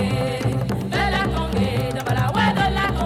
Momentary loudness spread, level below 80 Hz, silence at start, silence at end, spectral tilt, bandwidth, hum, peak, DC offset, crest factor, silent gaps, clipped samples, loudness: 4 LU; -32 dBFS; 0 s; 0 s; -6 dB/octave; 16 kHz; none; -8 dBFS; under 0.1%; 12 dB; none; under 0.1%; -21 LUFS